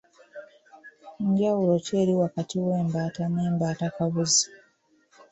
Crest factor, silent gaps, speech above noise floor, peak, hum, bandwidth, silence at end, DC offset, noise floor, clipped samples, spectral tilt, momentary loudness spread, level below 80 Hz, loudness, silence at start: 18 dB; none; 40 dB; -10 dBFS; none; 8.4 kHz; 0.75 s; under 0.1%; -64 dBFS; under 0.1%; -5 dB/octave; 10 LU; -64 dBFS; -25 LUFS; 0.35 s